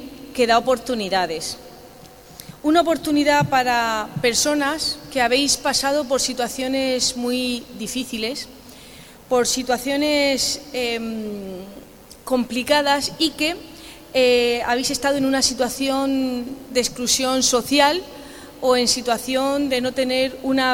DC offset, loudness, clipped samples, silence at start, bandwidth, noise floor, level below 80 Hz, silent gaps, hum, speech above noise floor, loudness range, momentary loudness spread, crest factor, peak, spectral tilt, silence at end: under 0.1%; -20 LUFS; under 0.1%; 0 s; 19.5 kHz; -44 dBFS; -50 dBFS; none; none; 23 dB; 4 LU; 14 LU; 20 dB; 0 dBFS; -2.5 dB/octave; 0 s